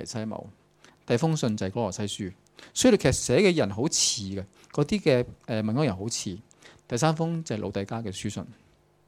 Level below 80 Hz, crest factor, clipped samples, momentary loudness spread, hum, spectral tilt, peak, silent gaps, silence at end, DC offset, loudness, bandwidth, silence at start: -54 dBFS; 20 dB; under 0.1%; 14 LU; none; -4.5 dB/octave; -6 dBFS; none; 0.55 s; under 0.1%; -26 LUFS; 16 kHz; 0 s